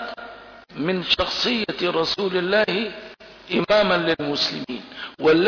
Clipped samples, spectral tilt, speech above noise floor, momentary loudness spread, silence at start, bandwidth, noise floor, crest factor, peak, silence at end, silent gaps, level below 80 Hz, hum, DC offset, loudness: under 0.1%; -5 dB/octave; 21 dB; 17 LU; 0 s; 5.4 kHz; -42 dBFS; 16 dB; -8 dBFS; 0 s; none; -52 dBFS; none; under 0.1%; -21 LUFS